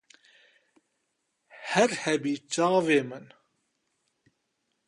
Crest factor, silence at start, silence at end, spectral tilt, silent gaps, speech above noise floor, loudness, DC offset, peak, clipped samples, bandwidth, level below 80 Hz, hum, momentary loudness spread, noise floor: 20 dB; 1.55 s; 1.65 s; -4 dB/octave; none; 52 dB; -26 LUFS; under 0.1%; -10 dBFS; under 0.1%; 11.5 kHz; -76 dBFS; none; 17 LU; -78 dBFS